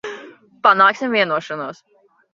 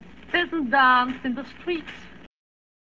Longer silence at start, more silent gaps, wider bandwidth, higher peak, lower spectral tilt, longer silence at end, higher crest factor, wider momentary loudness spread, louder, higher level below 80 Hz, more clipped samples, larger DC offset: second, 0.05 s vs 0.3 s; neither; about the same, 7.4 kHz vs 7.4 kHz; first, 0 dBFS vs -6 dBFS; about the same, -4.5 dB/octave vs -5 dB/octave; second, 0.6 s vs 0.8 s; about the same, 18 dB vs 18 dB; first, 20 LU vs 16 LU; first, -16 LUFS vs -23 LUFS; second, -70 dBFS vs -56 dBFS; neither; second, under 0.1% vs 0.3%